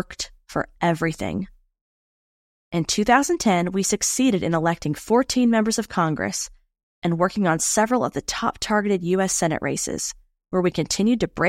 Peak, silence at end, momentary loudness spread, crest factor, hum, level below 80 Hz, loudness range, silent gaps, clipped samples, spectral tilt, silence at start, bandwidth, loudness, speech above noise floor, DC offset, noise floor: -4 dBFS; 0 s; 10 LU; 18 dB; none; -50 dBFS; 3 LU; 1.81-2.71 s, 6.83-7.02 s; under 0.1%; -4 dB/octave; 0 s; 16.5 kHz; -22 LUFS; over 68 dB; under 0.1%; under -90 dBFS